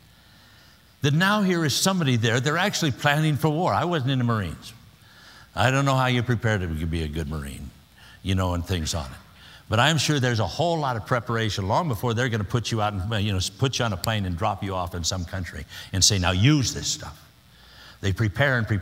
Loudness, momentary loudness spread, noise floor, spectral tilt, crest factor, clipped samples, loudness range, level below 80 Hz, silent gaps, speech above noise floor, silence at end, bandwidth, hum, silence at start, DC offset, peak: -24 LUFS; 12 LU; -53 dBFS; -4.5 dB/octave; 22 dB; under 0.1%; 4 LU; -44 dBFS; none; 30 dB; 0 s; 16 kHz; none; 1.05 s; under 0.1%; -2 dBFS